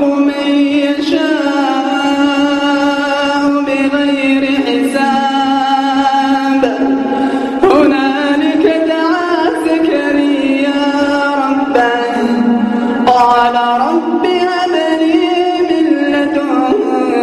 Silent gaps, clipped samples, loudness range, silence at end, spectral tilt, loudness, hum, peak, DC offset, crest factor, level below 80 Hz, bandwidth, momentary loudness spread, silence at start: none; under 0.1%; 1 LU; 0 s; -4.5 dB/octave; -12 LUFS; none; 0 dBFS; under 0.1%; 12 dB; -50 dBFS; 12 kHz; 3 LU; 0 s